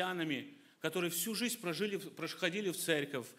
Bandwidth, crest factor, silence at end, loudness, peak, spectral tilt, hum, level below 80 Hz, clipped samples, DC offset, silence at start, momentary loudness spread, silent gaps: 16 kHz; 22 dB; 0.05 s; -37 LUFS; -16 dBFS; -3.5 dB/octave; none; -84 dBFS; under 0.1%; under 0.1%; 0 s; 7 LU; none